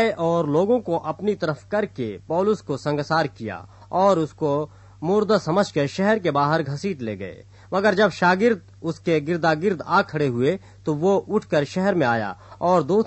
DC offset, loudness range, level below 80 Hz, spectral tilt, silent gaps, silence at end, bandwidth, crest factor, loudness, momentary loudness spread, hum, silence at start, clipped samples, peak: under 0.1%; 2 LU; -58 dBFS; -6.5 dB/octave; none; 0 s; 8.4 kHz; 16 dB; -22 LUFS; 10 LU; none; 0 s; under 0.1%; -6 dBFS